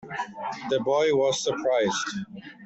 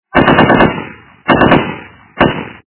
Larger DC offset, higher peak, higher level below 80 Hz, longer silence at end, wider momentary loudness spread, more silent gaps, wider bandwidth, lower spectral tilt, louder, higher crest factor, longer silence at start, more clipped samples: neither; second, -12 dBFS vs 0 dBFS; second, -66 dBFS vs -32 dBFS; second, 0 s vs 0.2 s; second, 12 LU vs 16 LU; neither; first, 8.4 kHz vs 4 kHz; second, -3.5 dB/octave vs -10 dB/octave; second, -26 LUFS vs -10 LUFS; about the same, 14 dB vs 12 dB; second, 0 s vs 0.15 s; second, under 0.1% vs 1%